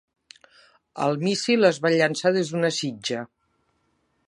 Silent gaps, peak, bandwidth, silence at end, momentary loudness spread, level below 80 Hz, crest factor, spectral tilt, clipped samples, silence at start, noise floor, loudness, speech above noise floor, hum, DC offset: none; -4 dBFS; 11.5 kHz; 1 s; 12 LU; -74 dBFS; 20 dB; -4.5 dB/octave; under 0.1%; 0.95 s; -70 dBFS; -23 LUFS; 47 dB; none; under 0.1%